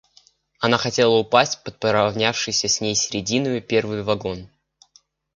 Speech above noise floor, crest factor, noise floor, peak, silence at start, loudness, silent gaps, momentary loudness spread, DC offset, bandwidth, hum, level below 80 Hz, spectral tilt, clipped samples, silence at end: 38 dB; 22 dB; -58 dBFS; 0 dBFS; 0.6 s; -20 LUFS; none; 7 LU; under 0.1%; 10 kHz; none; -54 dBFS; -3 dB/octave; under 0.1%; 0.9 s